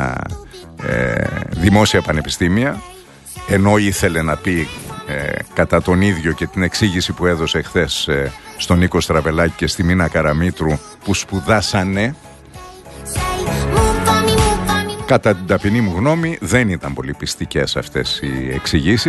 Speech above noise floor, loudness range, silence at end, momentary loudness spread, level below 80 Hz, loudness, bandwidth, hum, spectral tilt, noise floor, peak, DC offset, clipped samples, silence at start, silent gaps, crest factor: 20 dB; 2 LU; 0 s; 11 LU; -30 dBFS; -17 LUFS; 12.5 kHz; none; -5 dB/octave; -36 dBFS; 0 dBFS; under 0.1%; under 0.1%; 0 s; none; 16 dB